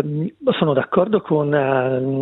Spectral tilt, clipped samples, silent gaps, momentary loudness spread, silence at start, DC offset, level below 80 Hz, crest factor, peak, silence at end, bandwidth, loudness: -10.5 dB/octave; under 0.1%; none; 4 LU; 0 s; under 0.1%; -60 dBFS; 16 dB; -2 dBFS; 0 s; 4.1 kHz; -19 LUFS